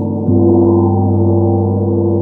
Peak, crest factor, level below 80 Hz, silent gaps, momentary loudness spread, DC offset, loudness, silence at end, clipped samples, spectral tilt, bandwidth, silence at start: 0 dBFS; 10 dB; -46 dBFS; none; 4 LU; under 0.1%; -12 LUFS; 0 s; under 0.1%; -15.5 dB/octave; 1.3 kHz; 0 s